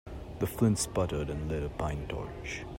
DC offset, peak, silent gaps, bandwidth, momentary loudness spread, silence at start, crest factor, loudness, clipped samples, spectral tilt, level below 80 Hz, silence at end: under 0.1%; -12 dBFS; none; 16 kHz; 11 LU; 0.05 s; 20 dB; -33 LUFS; under 0.1%; -5.5 dB/octave; -44 dBFS; 0 s